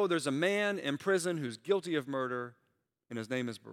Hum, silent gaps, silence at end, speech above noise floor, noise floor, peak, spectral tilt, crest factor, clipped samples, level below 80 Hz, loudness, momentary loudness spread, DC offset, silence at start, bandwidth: none; none; 0 s; 46 dB; -79 dBFS; -16 dBFS; -4.5 dB/octave; 18 dB; under 0.1%; -86 dBFS; -33 LUFS; 10 LU; under 0.1%; 0 s; 15.5 kHz